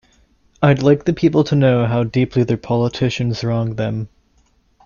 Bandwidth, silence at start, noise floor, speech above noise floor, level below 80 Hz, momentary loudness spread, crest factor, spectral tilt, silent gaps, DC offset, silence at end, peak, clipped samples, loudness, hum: 7.2 kHz; 0.6 s; -58 dBFS; 42 dB; -46 dBFS; 7 LU; 16 dB; -7.5 dB/octave; none; under 0.1%; 0.8 s; -2 dBFS; under 0.1%; -17 LUFS; none